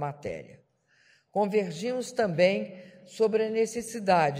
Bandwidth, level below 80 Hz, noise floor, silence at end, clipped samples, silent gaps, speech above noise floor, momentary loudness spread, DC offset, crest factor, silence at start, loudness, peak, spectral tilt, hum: 15.5 kHz; -66 dBFS; -65 dBFS; 0 s; under 0.1%; none; 37 dB; 16 LU; under 0.1%; 20 dB; 0 s; -28 LUFS; -8 dBFS; -5 dB/octave; none